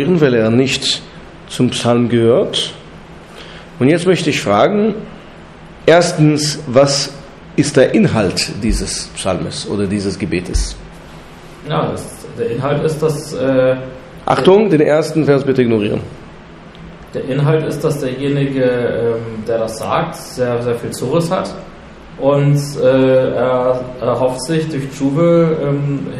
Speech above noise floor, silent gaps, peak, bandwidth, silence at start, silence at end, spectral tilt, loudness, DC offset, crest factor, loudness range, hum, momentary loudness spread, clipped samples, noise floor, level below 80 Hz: 22 dB; none; 0 dBFS; 13.5 kHz; 0 s; 0 s; -5.5 dB/octave; -15 LUFS; under 0.1%; 14 dB; 6 LU; none; 18 LU; under 0.1%; -36 dBFS; -34 dBFS